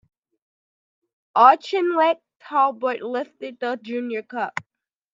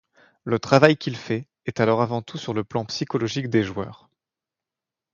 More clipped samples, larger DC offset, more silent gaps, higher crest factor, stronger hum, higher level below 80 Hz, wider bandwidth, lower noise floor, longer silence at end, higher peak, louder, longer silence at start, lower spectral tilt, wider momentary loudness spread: neither; neither; first, 2.36-2.40 s vs none; about the same, 22 dB vs 24 dB; neither; second, -80 dBFS vs -58 dBFS; about the same, 7.6 kHz vs 7.8 kHz; about the same, under -90 dBFS vs -88 dBFS; second, 0.5 s vs 1.2 s; about the same, 0 dBFS vs 0 dBFS; about the same, -21 LUFS vs -23 LUFS; first, 1.35 s vs 0.45 s; second, -4.5 dB/octave vs -6 dB/octave; about the same, 15 LU vs 14 LU